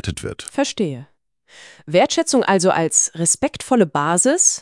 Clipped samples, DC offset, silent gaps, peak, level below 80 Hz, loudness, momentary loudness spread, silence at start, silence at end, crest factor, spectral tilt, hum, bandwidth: under 0.1%; under 0.1%; none; 0 dBFS; -50 dBFS; -17 LUFS; 11 LU; 0.05 s; 0 s; 18 dB; -3 dB/octave; none; 12 kHz